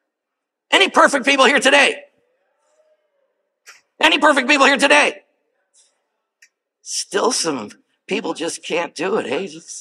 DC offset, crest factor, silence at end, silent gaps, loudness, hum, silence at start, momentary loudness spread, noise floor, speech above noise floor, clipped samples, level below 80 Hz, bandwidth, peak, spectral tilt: under 0.1%; 18 dB; 0 s; none; -15 LUFS; none; 0.7 s; 14 LU; -80 dBFS; 64 dB; under 0.1%; -70 dBFS; 15 kHz; 0 dBFS; -1.5 dB/octave